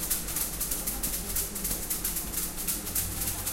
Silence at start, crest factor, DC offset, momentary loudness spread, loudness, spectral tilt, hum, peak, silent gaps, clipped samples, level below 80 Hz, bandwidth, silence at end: 0 s; 18 dB; under 0.1%; 2 LU; -29 LUFS; -2 dB/octave; none; -14 dBFS; none; under 0.1%; -42 dBFS; 17 kHz; 0 s